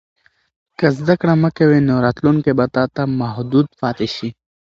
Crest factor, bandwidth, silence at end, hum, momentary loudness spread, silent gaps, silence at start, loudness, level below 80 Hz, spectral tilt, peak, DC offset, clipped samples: 16 dB; 7.4 kHz; 0.4 s; none; 8 LU; none; 0.8 s; -17 LUFS; -50 dBFS; -8.5 dB/octave; 0 dBFS; under 0.1%; under 0.1%